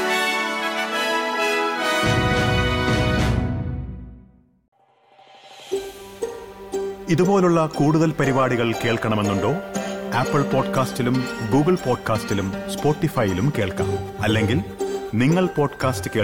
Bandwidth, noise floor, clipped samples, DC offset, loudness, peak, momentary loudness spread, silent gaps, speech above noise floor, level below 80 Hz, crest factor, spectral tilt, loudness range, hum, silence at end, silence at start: 17.5 kHz; -54 dBFS; under 0.1%; under 0.1%; -21 LUFS; -8 dBFS; 10 LU; 4.68-4.72 s; 34 dB; -40 dBFS; 14 dB; -5.5 dB/octave; 7 LU; none; 0 s; 0 s